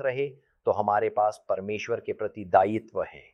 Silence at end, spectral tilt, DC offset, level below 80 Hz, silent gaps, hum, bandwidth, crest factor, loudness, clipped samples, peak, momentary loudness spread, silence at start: 0.15 s; -6.5 dB/octave; under 0.1%; -68 dBFS; none; none; 11 kHz; 22 dB; -27 LUFS; under 0.1%; -6 dBFS; 11 LU; 0 s